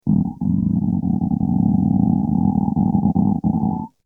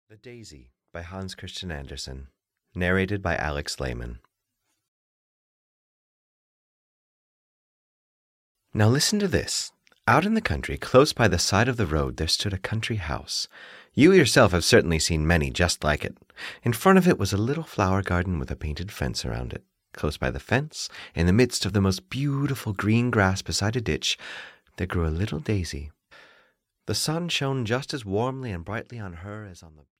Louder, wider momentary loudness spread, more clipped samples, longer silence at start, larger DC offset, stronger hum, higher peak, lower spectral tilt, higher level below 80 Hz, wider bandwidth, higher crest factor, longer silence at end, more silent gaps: first, -19 LUFS vs -24 LUFS; second, 3 LU vs 18 LU; neither; about the same, 0.05 s vs 0.1 s; first, 0.2% vs under 0.1%; neither; about the same, -4 dBFS vs -6 dBFS; first, -14 dB/octave vs -5 dB/octave; about the same, -38 dBFS vs -42 dBFS; second, 1.1 kHz vs 16 kHz; second, 14 dB vs 20 dB; about the same, 0.2 s vs 0.3 s; second, none vs 4.88-8.55 s